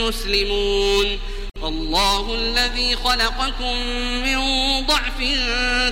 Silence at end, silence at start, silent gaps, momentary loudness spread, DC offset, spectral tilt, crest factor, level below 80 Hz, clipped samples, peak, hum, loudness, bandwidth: 0 s; 0 s; none; 5 LU; under 0.1%; -2.5 dB/octave; 16 dB; -26 dBFS; under 0.1%; -4 dBFS; none; -19 LUFS; 16.5 kHz